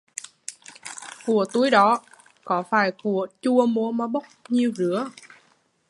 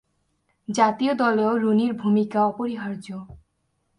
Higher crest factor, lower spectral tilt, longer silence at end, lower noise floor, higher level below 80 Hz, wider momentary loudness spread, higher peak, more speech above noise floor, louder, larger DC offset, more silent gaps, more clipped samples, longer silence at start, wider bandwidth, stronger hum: about the same, 20 dB vs 18 dB; about the same, -5 dB/octave vs -6 dB/octave; first, 0.8 s vs 0.6 s; second, -63 dBFS vs -72 dBFS; second, -76 dBFS vs -62 dBFS; first, 19 LU vs 15 LU; about the same, -4 dBFS vs -6 dBFS; second, 41 dB vs 50 dB; about the same, -23 LUFS vs -22 LUFS; neither; neither; neither; second, 0.5 s vs 0.7 s; about the same, 11.5 kHz vs 10.5 kHz; neither